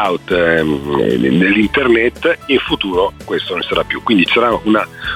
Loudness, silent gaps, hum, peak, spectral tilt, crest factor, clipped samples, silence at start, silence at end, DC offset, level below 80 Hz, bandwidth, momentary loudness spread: -14 LUFS; none; none; -2 dBFS; -6 dB/octave; 12 dB; under 0.1%; 0 s; 0 s; under 0.1%; -38 dBFS; 15 kHz; 6 LU